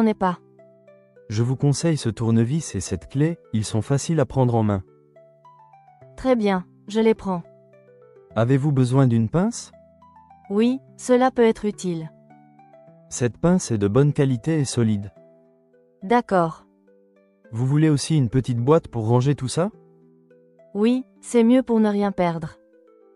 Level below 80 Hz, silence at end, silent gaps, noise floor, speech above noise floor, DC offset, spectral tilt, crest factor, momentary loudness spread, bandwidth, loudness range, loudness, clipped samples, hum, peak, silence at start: -52 dBFS; 0.65 s; none; -58 dBFS; 38 dB; under 0.1%; -7 dB/octave; 18 dB; 10 LU; 12 kHz; 3 LU; -22 LUFS; under 0.1%; none; -4 dBFS; 0 s